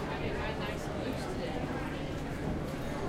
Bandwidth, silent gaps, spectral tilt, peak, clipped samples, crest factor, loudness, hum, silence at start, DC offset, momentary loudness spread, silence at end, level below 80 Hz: 16 kHz; none; -6 dB/octave; -24 dBFS; under 0.1%; 12 dB; -36 LUFS; none; 0 s; under 0.1%; 2 LU; 0 s; -44 dBFS